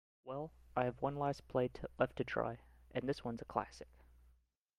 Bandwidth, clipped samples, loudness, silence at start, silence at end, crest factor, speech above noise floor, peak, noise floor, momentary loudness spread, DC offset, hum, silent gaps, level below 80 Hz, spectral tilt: 13.5 kHz; under 0.1%; -41 LUFS; 0.25 s; 0.9 s; 22 dB; 33 dB; -18 dBFS; -73 dBFS; 11 LU; under 0.1%; none; none; -62 dBFS; -7 dB/octave